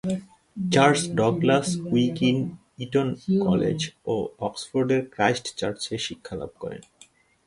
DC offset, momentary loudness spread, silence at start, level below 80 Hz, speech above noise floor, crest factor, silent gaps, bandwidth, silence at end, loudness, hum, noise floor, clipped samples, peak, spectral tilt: under 0.1%; 15 LU; 0.05 s; -56 dBFS; 32 dB; 20 dB; none; 11.5 kHz; 0.65 s; -24 LUFS; none; -56 dBFS; under 0.1%; -6 dBFS; -5.5 dB/octave